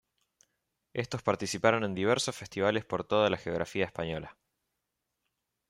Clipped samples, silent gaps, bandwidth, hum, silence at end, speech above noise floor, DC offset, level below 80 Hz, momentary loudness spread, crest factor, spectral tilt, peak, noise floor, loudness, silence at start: under 0.1%; none; 15.5 kHz; none; 1.4 s; 54 dB; under 0.1%; -64 dBFS; 10 LU; 22 dB; -4.5 dB/octave; -10 dBFS; -84 dBFS; -31 LUFS; 0.95 s